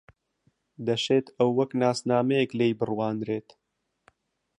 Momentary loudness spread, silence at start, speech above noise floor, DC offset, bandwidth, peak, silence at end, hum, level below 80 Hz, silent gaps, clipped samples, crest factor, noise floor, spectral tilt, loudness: 8 LU; 0.8 s; 45 dB; under 0.1%; 11 kHz; -10 dBFS; 1.2 s; none; -70 dBFS; none; under 0.1%; 18 dB; -71 dBFS; -6 dB/octave; -26 LUFS